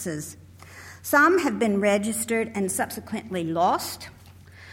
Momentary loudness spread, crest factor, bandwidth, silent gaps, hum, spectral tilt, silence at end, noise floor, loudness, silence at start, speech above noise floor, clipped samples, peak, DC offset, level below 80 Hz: 19 LU; 18 dB; 17 kHz; none; none; -4 dB/octave; 0 s; -47 dBFS; -24 LUFS; 0 s; 23 dB; under 0.1%; -6 dBFS; under 0.1%; -60 dBFS